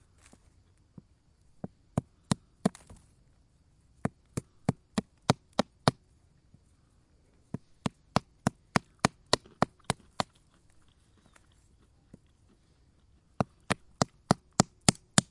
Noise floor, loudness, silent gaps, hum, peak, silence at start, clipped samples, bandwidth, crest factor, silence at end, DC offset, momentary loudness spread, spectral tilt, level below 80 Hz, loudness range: -65 dBFS; -32 LUFS; none; none; 0 dBFS; 1.95 s; under 0.1%; 11.5 kHz; 34 dB; 0.1 s; under 0.1%; 12 LU; -4 dB/octave; -58 dBFS; 6 LU